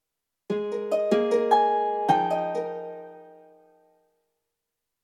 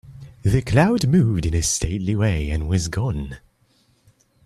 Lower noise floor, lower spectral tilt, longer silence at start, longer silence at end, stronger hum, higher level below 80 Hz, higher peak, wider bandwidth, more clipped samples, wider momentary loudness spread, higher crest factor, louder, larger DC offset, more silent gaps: first, -84 dBFS vs -61 dBFS; about the same, -6 dB/octave vs -5.5 dB/octave; first, 0.5 s vs 0.05 s; first, 1.7 s vs 1.1 s; neither; second, -80 dBFS vs -34 dBFS; second, -8 dBFS vs -4 dBFS; second, 12.5 kHz vs 14 kHz; neither; first, 16 LU vs 9 LU; about the same, 20 dB vs 18 dB; second, -25 LUFS vs -21 LUFS; neither; neither